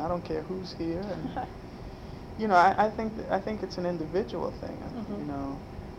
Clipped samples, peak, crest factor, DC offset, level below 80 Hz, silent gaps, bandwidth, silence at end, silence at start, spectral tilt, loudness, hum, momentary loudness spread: under 0.1%; -8 dBFS; 22 dB; under 0.1%; -48 dBFS; none; 15 kHz; 0 s; 0 s; -7 dB/octave; -30 LUFS; none; 18 LU